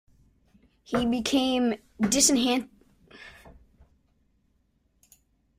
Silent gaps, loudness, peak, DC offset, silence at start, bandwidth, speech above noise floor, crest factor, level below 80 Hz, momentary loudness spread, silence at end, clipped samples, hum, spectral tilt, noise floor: none; -24 LUFS; -8 dBFS; under 0.1%; 0.9 s; 16 kHz; 45 dB; 22 dB; -56 dBFS; 27 LU; 2.3 s; under 0.1%; none; -2.5 dB/octave; -69 dBFS